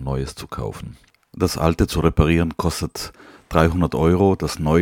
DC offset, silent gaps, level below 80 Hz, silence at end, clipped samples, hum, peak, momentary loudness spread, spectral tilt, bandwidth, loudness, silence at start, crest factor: under 0.1%; none; -32 dBFS; 0 s; under 0.1%; none; 0 dBFS; 14 LU; -6.5 dB/octave; 17 kHz; -20 LUFS; 0 s; 20 dB